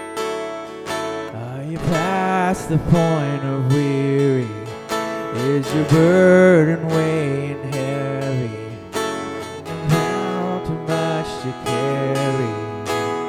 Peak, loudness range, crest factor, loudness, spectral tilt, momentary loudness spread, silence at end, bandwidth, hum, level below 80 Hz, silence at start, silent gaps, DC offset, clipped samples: 0 dBFS; 7 LU; 20 dB; -20 LUFS; -6.5 dB/octave; 13 LU; 0 s; 15 kHz; none; -46 dBFS; 0 s; none; under 0.1%; under 0.1%